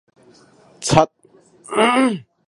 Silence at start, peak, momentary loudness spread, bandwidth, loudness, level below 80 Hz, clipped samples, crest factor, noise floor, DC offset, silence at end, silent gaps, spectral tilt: 0.8 s; 0 dBFS; 9 LU; 11.5 kHz; -18 LUFS; -48 dBFS; under 0.1%; 20 dB; -51 dBFS; under 0.1%; 0.25 s; none; -4.5 dB/octave